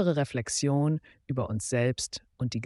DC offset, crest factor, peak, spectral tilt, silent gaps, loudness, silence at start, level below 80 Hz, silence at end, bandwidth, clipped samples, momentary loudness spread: under 0.1%; 14 dB; -14 dBFS; -5 dB/octave; none; -30 LUFS; 0 s; -58 dBFS; 0 s; 11.5 kHz; under 0.1%; 8 LU